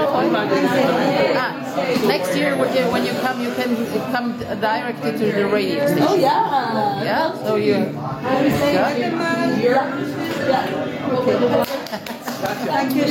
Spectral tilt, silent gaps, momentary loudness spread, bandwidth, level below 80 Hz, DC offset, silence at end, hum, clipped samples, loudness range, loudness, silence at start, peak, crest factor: -5.5 dB/octave; none; 7 LU; 17 kHz; -56 dBFS; under 0.1%; 0 s; none; under 0.1%; 2 LU; -19 LUFS; 0 s; -4 dBFS; 16 dB